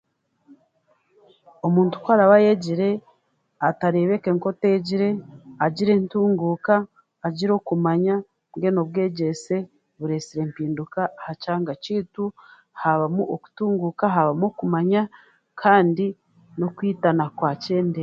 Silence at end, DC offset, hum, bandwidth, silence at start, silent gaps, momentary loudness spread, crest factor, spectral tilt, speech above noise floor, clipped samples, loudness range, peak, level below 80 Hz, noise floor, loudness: 0 s; under 0.1%; none; 7.8 kHz; 1.65 s; none; 11 LU; 20 dB; -7.5 dB/octave; 45 dB; under 0.1%; 6 LU; -2 dBFS; -68 dBFS; -66 dBFS; -22 LUFS